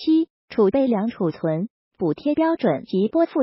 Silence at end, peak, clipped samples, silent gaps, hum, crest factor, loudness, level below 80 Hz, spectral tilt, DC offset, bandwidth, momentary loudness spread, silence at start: 0 s; -8 dBFS; under 0.1%; 0.30-0.48 s, 1.70-1.91 s; none; 14 dB; -22 LUFS; -60 dBFS; -7 dB/octave; under 0.1%; 5.8 kHz; 8 LU; 0 s